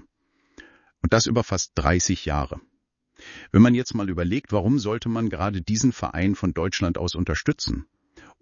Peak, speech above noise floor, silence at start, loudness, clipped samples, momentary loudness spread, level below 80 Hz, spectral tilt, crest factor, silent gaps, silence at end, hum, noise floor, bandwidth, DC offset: -2 dBFS; 46 dB; 0.6 s; -23 LUFS; under 0.1%; 10 LU; -38 dBFS; -5 dB/octave; 20 dB; none; 0.2 s; none; -68 dBFS; 7.4 kHz; under 0.1%